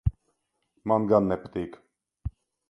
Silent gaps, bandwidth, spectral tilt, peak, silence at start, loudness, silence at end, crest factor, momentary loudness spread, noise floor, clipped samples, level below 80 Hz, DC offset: none; 9.8 kHz; -10 dB/octave; -6 dBFS; 0.05 s; -26 LUFS; 0.4 s; 22 dB; 18 LU; -76 dBFS; under 0.1%; -42 dBFS; under 0.1%